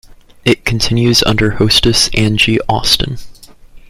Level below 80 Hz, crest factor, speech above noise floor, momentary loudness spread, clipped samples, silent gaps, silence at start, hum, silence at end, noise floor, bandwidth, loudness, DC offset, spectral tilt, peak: -28 dBFS; 14 dB; 25 dB; 5 LU; under 0.1%; none; 0.45 s; none; 0.1 s; -37 dBFS; 16 kHz; -11 LUFS; under 0.1%; -4 dB/octave; 0 dBFS